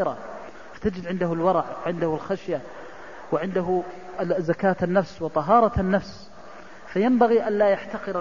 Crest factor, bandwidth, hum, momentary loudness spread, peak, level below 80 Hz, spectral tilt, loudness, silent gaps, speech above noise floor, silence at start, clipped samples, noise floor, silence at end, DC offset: 18 dB; 7.4 kHz; none; 22 LU; -6 dBFS; -48 dBFS; -8 dB/octave; -24 LUFS; none; 21 dB; 0 s; under 0.1%; -44 dBFS; 0 s; 0.6%